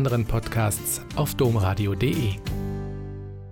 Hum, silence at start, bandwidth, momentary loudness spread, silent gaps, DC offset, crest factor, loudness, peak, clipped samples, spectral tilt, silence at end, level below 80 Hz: 50 Hz at -40 dBFS; 0 s; 17.5 kHz; 12 LU; none; under 0.1%; 14 dB; -25 LUFS; -10 dBFS; under 0.1%; -5.5 dB/octave; 0 s; -38 dBFS